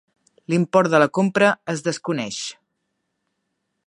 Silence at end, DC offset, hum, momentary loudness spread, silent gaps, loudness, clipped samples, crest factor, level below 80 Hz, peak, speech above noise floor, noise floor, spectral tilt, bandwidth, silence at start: 1.35 s; under 0.1%; none; 11 LU; none; -20 LUFS; under 0.1%; 20 dB; -70 dBFS; -2 dBFS; 56 dB; -75 dBFS; -5 dB/octave; 11 kHz; 0.5 s